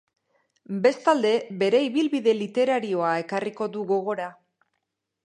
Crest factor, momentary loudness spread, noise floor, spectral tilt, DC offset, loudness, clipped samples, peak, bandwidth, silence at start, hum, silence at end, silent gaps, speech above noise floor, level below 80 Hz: 18 dB; 9 LU; -80 dBFS; -5.5 dB/octave; under 0.1%; -24 LUFS; under 0.1%; -6 dBFS; 10.5 kHz; 0.7 s; none; 0.95 s; none; 57 dB; -78 dBFS